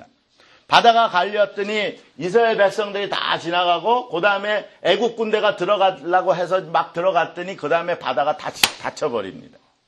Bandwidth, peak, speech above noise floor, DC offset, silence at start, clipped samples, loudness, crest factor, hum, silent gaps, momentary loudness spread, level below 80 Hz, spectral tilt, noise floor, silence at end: 12 kHz; 0 dBFS; 35 dB; under 0.1%; 0 s; under 0.1%; -19 LUFS; 20 dB; none; none; 8 LU; -64 dBFS; -3 dB/octave; -54 dBFS; 0.45 s